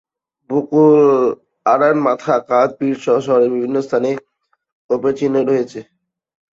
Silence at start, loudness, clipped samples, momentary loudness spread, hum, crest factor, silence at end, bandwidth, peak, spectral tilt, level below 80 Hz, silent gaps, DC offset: 0.5 s; -16 LUFS; under 0.1%; 10 LU; none; 14 dB; 0.75 s; 7.6 kHz; -2 dBFS; -7.5 dB/octave; -64 dBFS; 4.72-4.89 s; under 0.1%